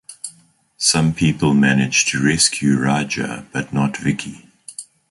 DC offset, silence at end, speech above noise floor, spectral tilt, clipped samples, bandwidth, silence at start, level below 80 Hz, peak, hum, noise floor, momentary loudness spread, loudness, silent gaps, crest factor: under 0.1%; 0.3 s; 36 dB; -3.5 dB/octave; under 0.1%; 11.5 kHz; 0.1 s; -48 dBFS; -2 dBFS; none; -53 dBFS; 19 LU; -17 LUFS; none; 16 dB